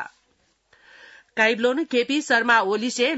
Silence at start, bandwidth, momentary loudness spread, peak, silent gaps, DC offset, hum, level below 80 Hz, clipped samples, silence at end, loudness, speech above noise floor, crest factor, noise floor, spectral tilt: 0 s; 8 kHz; 8 LU; -6 dBFS; none; under 0.1%; none; -74 dBFS; under 0.1%; 0 s; -20 LUFS; 45 dB; 18 dB; -66 dBFS; -2.5 dB/octave